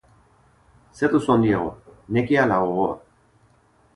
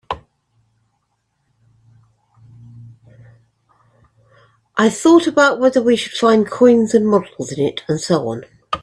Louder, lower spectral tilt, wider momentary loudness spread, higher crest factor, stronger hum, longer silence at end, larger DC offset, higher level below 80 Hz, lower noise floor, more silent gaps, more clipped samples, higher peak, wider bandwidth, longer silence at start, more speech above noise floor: second, -21 LUFS vs -15 LUFS; first, -7.5 dB/octave vs -5 dB/octave; second, 8 LU vs 15 LU; about the same, 18 dB vs 18 dB; neither; first, 0.95 s vs 0.05 s; neither; about the same, -52 dBFS vs -56 dBFS; second, -59 dBFS vs -68 dBFS; neither; neither; second, -4 dBFS vs 0 dBFS; about the same, 11 kHz vs 12 kHz; first, 0.95 s vs 0.1 s; second, 39 dB vs 54 dB